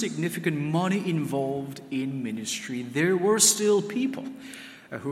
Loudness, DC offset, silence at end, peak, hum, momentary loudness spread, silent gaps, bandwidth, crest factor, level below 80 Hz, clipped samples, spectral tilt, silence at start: -25 LUFS; under 0.1%; 0 s; -8 dBFS; none; 19 LU; none; 16 kHz; 20 dB; -72 dBFS; under 0.1%; -4 dB/octave; 0 s